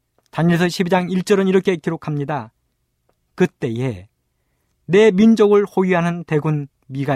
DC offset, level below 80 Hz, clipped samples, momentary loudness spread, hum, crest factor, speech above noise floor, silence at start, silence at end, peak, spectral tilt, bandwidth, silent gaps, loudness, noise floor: under 0.1%; -58 dBFS; under 0.1%; 13 LU; none; 16 dB; 53 dB; 0.35 s; 0 s; -2 dBFS; -7 dB/octave; 14 kHz; none; -17 LUFS; -69 dBFS